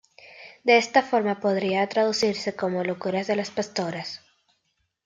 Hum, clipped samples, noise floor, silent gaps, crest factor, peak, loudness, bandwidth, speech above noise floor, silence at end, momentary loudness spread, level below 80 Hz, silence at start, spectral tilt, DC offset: none; under 0.1%; -74 dBFS; none; 22 dB; -4 dBFS; -24 LUFS; 9.2 kHz; 50 dB; 0.9 s; 14 LU; -70 dBFS; 0.25 s; -4.5 dB/octave; under 0.1%